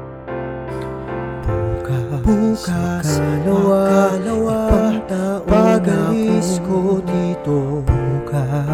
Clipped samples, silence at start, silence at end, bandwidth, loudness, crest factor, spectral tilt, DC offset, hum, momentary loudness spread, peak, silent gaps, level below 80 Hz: under 0.1%; 0 s; 0 s; 16 kHz; -18 LUFS; 16 dB; -7 dB/octave; under 0.1%; none; 12 LU; -2 dBFS; none; -30 dBFS